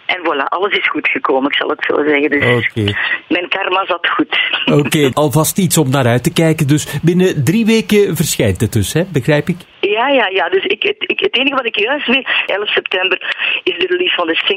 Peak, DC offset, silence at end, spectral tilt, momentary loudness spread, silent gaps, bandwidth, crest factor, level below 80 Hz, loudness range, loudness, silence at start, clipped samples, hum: 0 dBFS; under 0.1%; 0 s; -4.5 dB/octave; 4 LU; none; 16 kHz; 14 dB; -46 dBFS; 1 LU; -13 LUFS; 0.1 s; under 0.1%; none